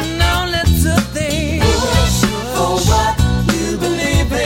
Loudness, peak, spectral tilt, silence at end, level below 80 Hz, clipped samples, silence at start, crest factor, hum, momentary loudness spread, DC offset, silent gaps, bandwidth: -15 LUFS; -2 dBFS; -4.5 dB/octave; 0 s; -20 dBFS; under 0.1%; 0 s; 14 dB; none; 4 LU; under 0.1%; none; 17 kHz